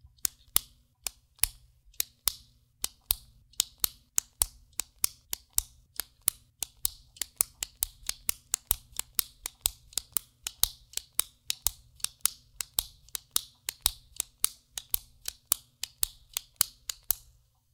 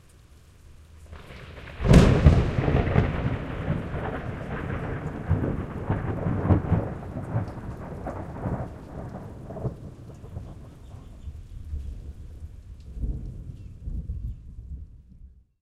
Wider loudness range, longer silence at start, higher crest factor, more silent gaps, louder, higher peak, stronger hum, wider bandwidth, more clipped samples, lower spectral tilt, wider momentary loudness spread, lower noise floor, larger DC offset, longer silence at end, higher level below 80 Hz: second, 1 LU vs 17 LU; about the same, 0.25 s vs 0.35 s; first, 36 dB vs 24 dB; neither; second, -32 LUFS vs -27 LUFS; about the same, 0 dBFS vs -2 dBFS; neither; first, 19 kHz vs 11.5 kHz; neither; second, 1 dB/octave vs -8 dB/octave; second, 10 LU vs 20 LU; first, -63 dBFS vs -52 dBFS; neither; first, 0.55 s vs 0.35 s; second, -52 dBFS vs -34 dBFS